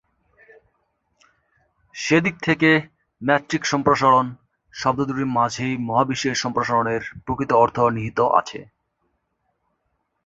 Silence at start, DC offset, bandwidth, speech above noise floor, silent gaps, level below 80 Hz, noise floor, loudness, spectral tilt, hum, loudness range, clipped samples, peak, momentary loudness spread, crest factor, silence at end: 1.95 s; under 0.1%; 8 kHz; 53 dB; none; -54 dBFS; -73 dBFS; -20 LUFS; -5 dB/octave; none; 3 LU; under 0.1%; -2 dBFS; 12 LU; 20 dB; 1.6 s